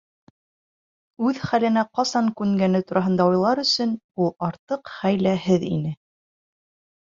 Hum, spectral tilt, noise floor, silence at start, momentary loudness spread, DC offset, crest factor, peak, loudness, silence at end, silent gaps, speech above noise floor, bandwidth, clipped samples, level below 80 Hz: none; -6 dB/octave; under -90 dBFS; 1.2 s; 8 LU; under 0.1%; 18 dB; -6 dBFS; -22 LUFS; 1.1 s; 4.04-4.09 s, 4.59-4.68 s; over 68 dB; 7.6 kHz; under 0.1%; -60 dBFS